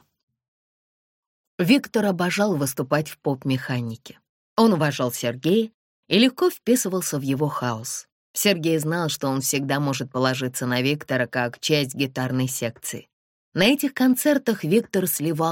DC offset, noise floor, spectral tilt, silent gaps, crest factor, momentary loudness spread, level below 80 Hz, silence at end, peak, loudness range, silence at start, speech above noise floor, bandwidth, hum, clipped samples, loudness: under 0.1%; under -90 dBFS; -4.5 dB/octave; 4.29-4.56 s, 5.74-6.03 s, 8.12-8.34 s, 13.13-13.52 s; 20 dB; 10 LU; -66 dBFS; 0 s; -4 dBFS; 2 LU; 1.6 s; over 68 dB; 17 kHz; none; under 0.1%; -23 LUFS